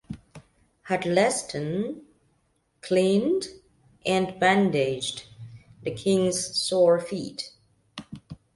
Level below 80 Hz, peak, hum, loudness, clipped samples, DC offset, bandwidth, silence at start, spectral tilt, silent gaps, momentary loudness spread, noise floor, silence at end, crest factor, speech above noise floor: -60 dBFS; -8 dBFS; none; -25 LUFS; under 0.1%; under 0.1%; 11.5 kHz; 0.1 s; -4.5 dB/octave; none; 22 LU; -69 dBFS; 0.2 s; 20 dB; 45 dB